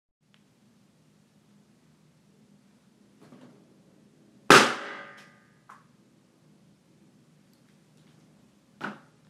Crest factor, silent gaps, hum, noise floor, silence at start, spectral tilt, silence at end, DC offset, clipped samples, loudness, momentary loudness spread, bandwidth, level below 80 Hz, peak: 30 dB; none; none; -63 dBFS; 4.5 s; -2.5 dB/octave; 0.35 s; under 0.1%; under 0.1%; -21 LUFS; 25 LU; 15 kHz; -72 dBFS; -2 dBFS